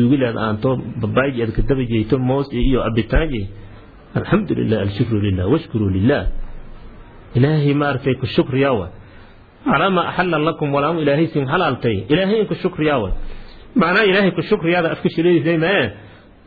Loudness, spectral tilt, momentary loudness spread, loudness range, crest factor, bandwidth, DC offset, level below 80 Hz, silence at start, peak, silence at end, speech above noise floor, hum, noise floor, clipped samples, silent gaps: -18 LUFS; -10 dB/octave; 8 LU; 3 LU; 16 dB; 4.9 kHz; under 0.1%; -30 dBFS; 0 s; -2 dBFS; 0.35 s; 25 dB; none; -42 dBFS; under 0.1%; none